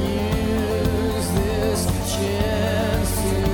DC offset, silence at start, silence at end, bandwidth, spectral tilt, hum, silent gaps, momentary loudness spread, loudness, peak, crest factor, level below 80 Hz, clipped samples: under 0.1%; 0 s; 0 s; 17.5 kHz; -5.5 dB/octave; none; none; 1 LU; -22 LUFS; -8 dBFS; 14 dB; -30 dBFS; under 0.1%